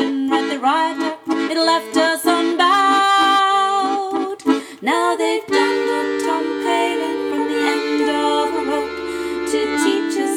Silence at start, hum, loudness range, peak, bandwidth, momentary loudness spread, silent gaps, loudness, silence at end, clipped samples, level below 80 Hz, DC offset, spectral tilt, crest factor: 0 s; none; 4 LU; -4 dBFS; 17 kHz; 8 LU; none; -18 LUFS; 0 s; under 0.1%; -58 dBFS; under 0.1%; -2 dB/octave; 14 dB